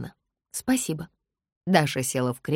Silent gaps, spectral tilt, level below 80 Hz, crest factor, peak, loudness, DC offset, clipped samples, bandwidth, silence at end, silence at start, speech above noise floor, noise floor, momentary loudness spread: 1.52-1.61 s; -4.5 dB/octave; -60 dBFS; 24 dB; -4 dBFS; -26 LUFS; under 0.1%; under 0.1%; 16.5 kHz; 0 s; 0 s; 22 dB; -47 dBFS; 16 LU